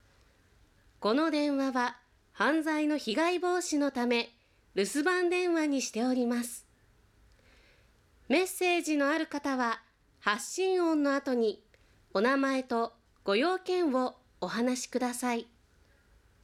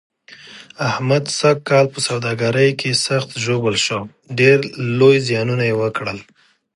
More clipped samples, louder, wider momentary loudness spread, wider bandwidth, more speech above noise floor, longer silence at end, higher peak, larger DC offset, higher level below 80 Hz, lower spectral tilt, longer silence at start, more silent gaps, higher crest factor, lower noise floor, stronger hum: neither; second, -30 LUFS vs -17 LUFS; second, 8 LU vs 12 LU; first, 16 kHz vs 11.5 kHz; first, 35 dB vs 24 dB; first, 1 s vs 0.55 s; second, -10 dBFS vs 0 dBFS; neither; second, -70 dBFS vs -58 dBFS; second, -3 dB/octave vs -4.5 dB/octave; first, 1 s vs 0.45 s; neither; about the same, 20 dB vs 16 dB; first, -64 dBFS vs -41 dBFS; neither